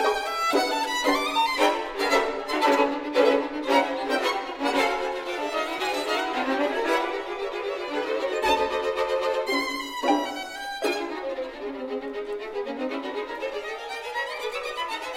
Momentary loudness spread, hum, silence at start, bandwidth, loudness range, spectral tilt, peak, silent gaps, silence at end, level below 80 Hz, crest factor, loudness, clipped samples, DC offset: 10 LU; none; 0 s; 16 kHz; 8 LU; -2 dB/octave; -6 dBFS; none; 0 s; -56 dBFS; 20 dB; -26 LUFS; under 0.1%; under 0.1%